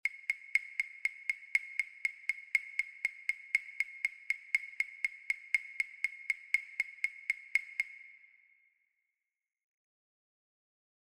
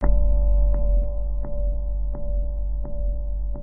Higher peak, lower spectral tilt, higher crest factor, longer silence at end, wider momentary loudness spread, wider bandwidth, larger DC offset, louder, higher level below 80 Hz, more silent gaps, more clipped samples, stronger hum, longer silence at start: second, -14 dBFS vs -6 dBFS; second, 3.5 dB/octave vs -13.5 dB/octave; first, 24 dB vs 14 dB; first, 3 s vs 0 s; second, 5 LU vs 8 LU; first, 16 kHz vs 2.1 kHz; neither; second, -35 LUFS vs -27 LUFS; second, -84 dBFS vs -22 dBFS; neither; neither; neither; about the same, 0.05 s vs 0 s